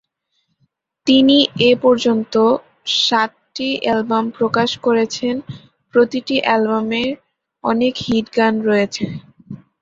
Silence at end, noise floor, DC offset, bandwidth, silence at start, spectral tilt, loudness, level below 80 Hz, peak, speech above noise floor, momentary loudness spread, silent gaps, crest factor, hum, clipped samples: 0.25 s; -69 dBFS; under 0.1%; 7.8 kHz; 1.05 s; -4.5 dB/octave; -17 LUFS; -56 dBFS; 0 dBFS; 53 dB; 12 LU; none; 16 dB; none; under 0.1%